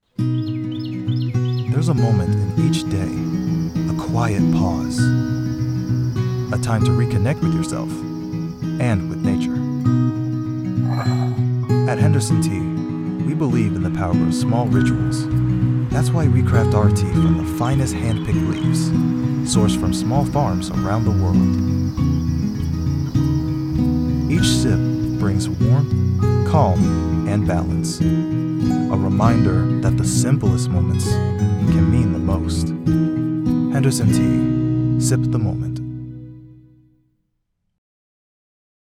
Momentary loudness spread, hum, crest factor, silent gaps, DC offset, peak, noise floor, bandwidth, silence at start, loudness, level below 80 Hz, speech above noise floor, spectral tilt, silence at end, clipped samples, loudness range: 6 LU; none; 16 dB; none; under 0.1%; -2 dBFS; -71 dBFS; 14.5 kHz; 0.2 s; -19 LUFS; -38 dBFS; 54 dB; -7 dB/octave; 2.35 s; under 0.1%; 3 LU